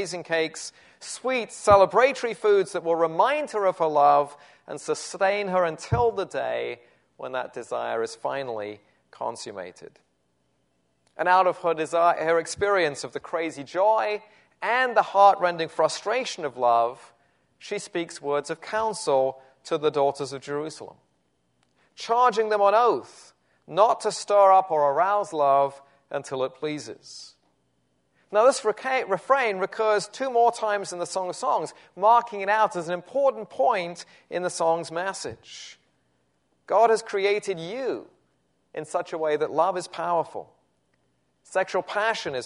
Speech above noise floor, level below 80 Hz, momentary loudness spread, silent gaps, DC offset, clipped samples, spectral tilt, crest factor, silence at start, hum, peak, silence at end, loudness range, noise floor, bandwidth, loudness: 47 dB; -62 dBFS; 15 LU; none; under 0.1%; under 0.1%; -4 dB/octave; 22 dB; 0 s; none; -4 dBFS; 0 s; 7 LU; -71 dBFS; 11 kHz; -24 LUFS